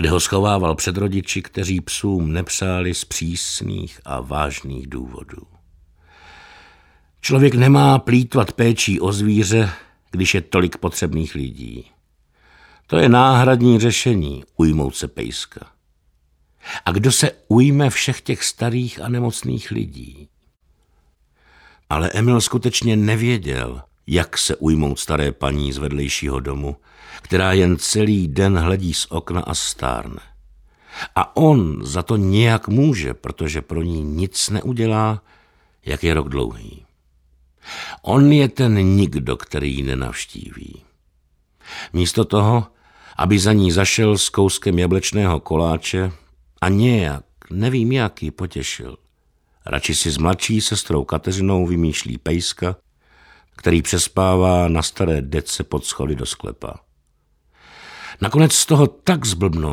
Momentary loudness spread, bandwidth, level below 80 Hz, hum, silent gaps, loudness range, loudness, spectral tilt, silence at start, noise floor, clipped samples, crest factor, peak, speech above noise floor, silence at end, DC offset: 16 LU; 16.5 kHz; -36 dBFS; none; none; 7 LU; -18 LUFS; -5 dB/octave; 0 s; -62 dBFS; under 0.1%; 18 dB; -2 dBFS; 44 dB; 0 s; under 0.1%